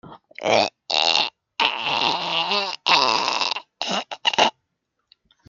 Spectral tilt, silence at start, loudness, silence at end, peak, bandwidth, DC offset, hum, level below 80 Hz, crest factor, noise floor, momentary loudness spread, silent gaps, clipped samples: -1.5 dB/octave; 0.05 s; -20 LUFS; 1 s; 0 dBFS; 7.8 kHz; under 0.1%; none; -70 dBFS; 22 dB; -76 dBFS; 8 LU; none; under 0.1%